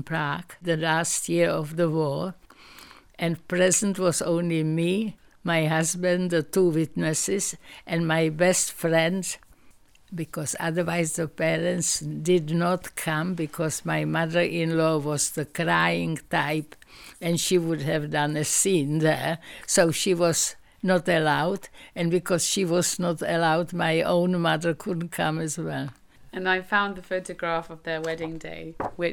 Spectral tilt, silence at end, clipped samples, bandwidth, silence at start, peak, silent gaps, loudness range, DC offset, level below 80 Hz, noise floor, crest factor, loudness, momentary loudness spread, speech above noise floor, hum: -4 dB/octave; 0 s; under 0.1%; 19 kHz; 0 s; -6 dBFS; none; 3 LU; under 0.1%; -58 dBFS; -54 dBFS; 18 dB; -25 LUFS; 10 LU; 29 dB; none